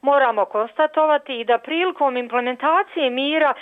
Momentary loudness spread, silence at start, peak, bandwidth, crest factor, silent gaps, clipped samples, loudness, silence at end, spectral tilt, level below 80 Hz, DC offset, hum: 5 LU; 0.05 s; -8 dBFS; 4.5 kHz; 12 dB; none; under 0.1%; -20 LUFS; 0 s; -5 dB/octave; -74 dBFS; under 0.1%; none